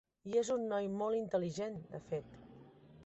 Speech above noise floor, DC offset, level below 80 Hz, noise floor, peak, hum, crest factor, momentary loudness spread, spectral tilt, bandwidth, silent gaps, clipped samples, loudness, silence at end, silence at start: 22 dB; under 0.1%; -72 dBFS; -59 dBFS; -22 dBFS; none; 16 dB; 18 LU; -6 dB/octave; 8 kHz; none; under 0.1%; -38 LUFS; 0.05 s; 0.25 s